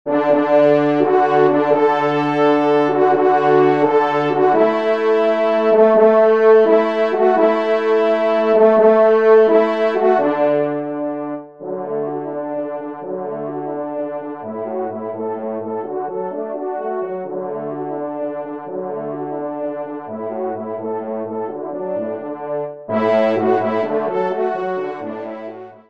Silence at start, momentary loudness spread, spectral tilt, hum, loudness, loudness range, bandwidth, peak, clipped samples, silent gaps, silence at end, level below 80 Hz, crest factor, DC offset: 0.05 s; 14 LU; -7.5 dB/octave; none; -17 LUFS; 12 LU; 6.2 kHz; -2 dBFS; under 0.1%; none; 0.15 s; -68 dBFS; 16 dB; 0.2%